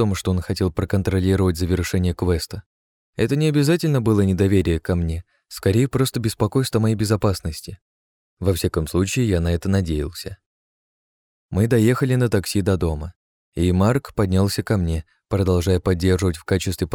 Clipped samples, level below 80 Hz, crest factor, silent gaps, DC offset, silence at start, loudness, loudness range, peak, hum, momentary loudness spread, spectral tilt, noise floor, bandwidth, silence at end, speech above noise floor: under 0.1%; -36 dBFS; 14 dB; 2.66-3.13 s, 7.82-8.37 s, 10.46-11.49 s, 13.16-13.52 s; under 0.1%; 0 s; -21 LUFS; 3 LU; -6 dBFS; none; 10 LU; -6.5 dB/octave; under -90 dBFS; 18 kHz; 0 s; over 70 dB